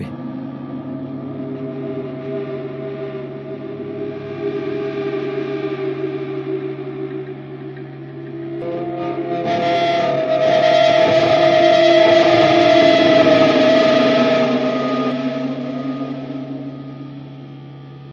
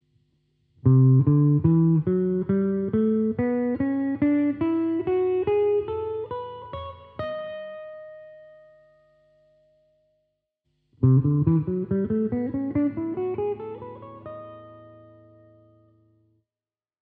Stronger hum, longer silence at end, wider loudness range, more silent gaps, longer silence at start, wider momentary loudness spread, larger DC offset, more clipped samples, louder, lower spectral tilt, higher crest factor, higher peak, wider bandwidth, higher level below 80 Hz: neither; second, 0 s vs 2.15 s; about the same, 15 LU vs 17 LU; neither; second, 0 s vs 0.85 s; about the same, 20 LU vs 20 LU; neither; neither; first, -16 LUFS vs -23 LUFS; second, -6 dB/octave vs -10 dB/octave; about the same, 16 dB vs 18 dB; first, 0 dBFS vs -8 dBFS; first, 7.2 kHz vs 3.9 kHz; about the same, -58 dBFS vs -54 dBFS